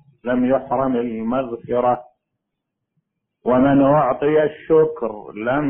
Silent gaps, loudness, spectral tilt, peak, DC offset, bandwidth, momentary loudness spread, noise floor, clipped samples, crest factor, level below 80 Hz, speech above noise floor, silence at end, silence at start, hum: none; -19 LUFS; -12 dB/octave; -4 dBFS; under 0.1%; 3.5 kHz; 11 LU; -79 dBFS; under 0.1%; 16 dB; -50 dBFS; 61 dB; 0 s; 0.25 s; none